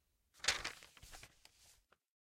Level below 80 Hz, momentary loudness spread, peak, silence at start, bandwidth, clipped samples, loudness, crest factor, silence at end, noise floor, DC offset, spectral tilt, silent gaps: -68 dBFS; 20 LU; -18 dBFS; 0.35 s; 16.5 kHz; under 0.1%; -40 LUFS; 30 dB; 0.5 s; -71 dBFS; under 0.1%; 0.5 dB/octave; none